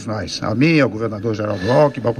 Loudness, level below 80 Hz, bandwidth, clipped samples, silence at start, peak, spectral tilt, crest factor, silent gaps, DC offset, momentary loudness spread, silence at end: -18 LUFS; -50 dBFS; 10 kHz; under 0.1%; 0 s; -2 dBFS; -6.5 dB/octave; 14 dB; none; under 0.1%; 8 LU; 0 s